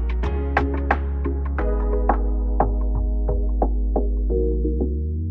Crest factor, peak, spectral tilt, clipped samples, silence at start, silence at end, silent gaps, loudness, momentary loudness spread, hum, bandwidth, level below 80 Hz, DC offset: 18 dB; -2 dBFS; -10 dB/octave; under 0.1%; 0 s; 0 s; none; -23 LUFS; 2 LU; none; 3.8 kHz; -22 dBFS; under 0.1%